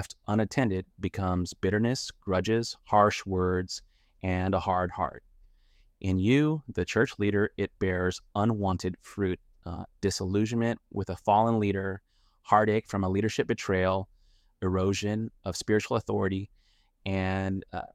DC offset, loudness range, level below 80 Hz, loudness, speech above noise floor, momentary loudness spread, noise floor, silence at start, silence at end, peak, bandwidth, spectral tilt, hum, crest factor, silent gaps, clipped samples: under 0.1%; 3 LU; -54 dBFS; -29 LUFS; 34 dB; 11 LU; -62 dBFS; 0 s; 0.1 s; -6 dBFS; 14 kHz; -6 dB/octave; none; 22 dB; none; under 0.1%